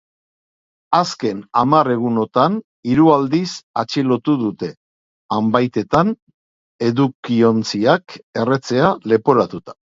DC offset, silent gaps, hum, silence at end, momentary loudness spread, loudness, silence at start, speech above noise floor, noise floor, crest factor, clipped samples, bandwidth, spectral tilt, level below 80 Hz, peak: under 0.1%; 2.64-2.83 s, 3.63-3.74 s, 4.77-5.29 s, 6.22-6.27 s, 6.34-6.79 s, 7.15-7.23 s, 8.23-8.33 s; none; 0.15 s; 9 LU; -17 LUFS; 0.9 s; over 73 dB; under -90 dBFS; 18 dB; under 0.1%; 7.8 kHz; -6.5 dB/octave; -54 dBFS; 0 dBFS